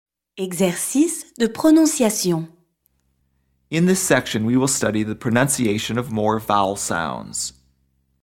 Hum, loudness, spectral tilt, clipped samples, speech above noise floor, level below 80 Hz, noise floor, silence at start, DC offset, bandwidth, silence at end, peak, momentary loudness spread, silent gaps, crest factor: none; -20 LUFS; -4.5 dB/octave; under 0.1%; 47 dB; -54 dBFS; -67 dBFS; 0.35 s; under 0.1%; 17.5 kHz; 0.75 s; -4 dBFS; 11 LU; none; 18 dB